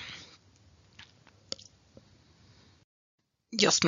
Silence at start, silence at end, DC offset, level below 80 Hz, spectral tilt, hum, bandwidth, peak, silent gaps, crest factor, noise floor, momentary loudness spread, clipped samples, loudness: 0 s; 0 s; under 0.1%; -74 dBFS; -2 dB/octave; none; 7.6 kHz; -10 dBFS; 2.84-3.18 s; 26 dB; -61 dBFS; 29 LU; under 0.1%; -32 LUFS